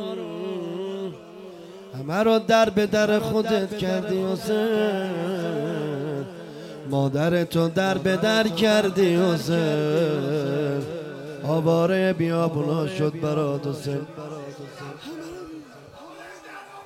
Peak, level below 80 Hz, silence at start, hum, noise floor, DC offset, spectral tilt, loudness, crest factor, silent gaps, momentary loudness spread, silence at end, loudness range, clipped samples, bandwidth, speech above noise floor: -6 dBFS; -60 dBFS; 0 s; none; -44 dBFS; under 0.1%; -6 dB/octave; -23 LUFS; 18 dB; none; 18 LU; 0 s; 6 LU; under 0.1%; 16 kHz; 22 dB